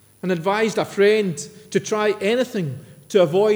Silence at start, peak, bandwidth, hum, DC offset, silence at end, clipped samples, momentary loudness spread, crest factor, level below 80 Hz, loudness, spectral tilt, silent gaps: 0.25 s; -6 dBFS; over 20 kHz; none; under 0.1%; 0 s; under 0.1%; 10 LU; 16 dB; -70 dBFS; -20 LUFS; -5 dB/octave; none